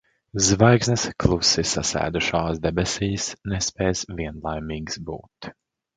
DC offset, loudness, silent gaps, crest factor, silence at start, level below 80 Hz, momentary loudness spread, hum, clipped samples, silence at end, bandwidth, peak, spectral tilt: under 0.1%; -22 LUFS; none; 22 dB; 0.35 s; -40 dBFS; 16 LU; none; under 0.1%; 0.45 s; 9.6 kHz; 0 dBFS; -4 dB/octave